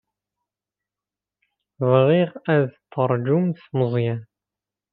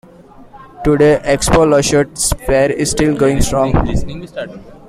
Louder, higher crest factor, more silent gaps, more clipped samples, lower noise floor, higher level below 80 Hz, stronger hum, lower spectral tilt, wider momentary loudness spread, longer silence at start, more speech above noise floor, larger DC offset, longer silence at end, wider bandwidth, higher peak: second, -21 LUFS vs -13 LUFS; first, 20 dB vs 14 dB; neither; neither; first, -89 dBFS vs -40 dBFS; second, -68 dBFS vs -26 dBFS; neither; first, -11.5 dB/octave vs -5 dB/octave; second, 9 LU vs 15 LU; first, 1.8 s vs 0.4 s; first, 69 dB vs 27 dB; neither; first, 0.7 s vs 0.15 s; second, 4.7 kHz vs 16 kHz; about the same, -2 dBFS vs 0 dBFS